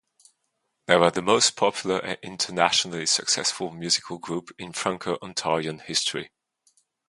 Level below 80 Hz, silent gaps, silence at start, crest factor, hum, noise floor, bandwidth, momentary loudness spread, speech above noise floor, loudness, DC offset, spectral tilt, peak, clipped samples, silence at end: -64 dBFS; none; 0.9 s; 26 dB; none; -77 dBFS; 11.5 kHz; 13 LU; 52 dB; -24 LUFS; under 0.1%; -2 dB/octave; 0 dBFS; under 0.1%; 0.8 s